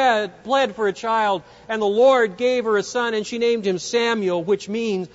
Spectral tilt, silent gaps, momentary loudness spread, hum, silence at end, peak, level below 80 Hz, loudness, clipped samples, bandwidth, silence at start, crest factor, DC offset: -4 dB/octave; none; 8 LU; none; 0.1 s; -6 dBFS; -62 dBFS; -21 LUFS; under 0.1%; 8 kHz; 0 s; 14 dB; under 0.1%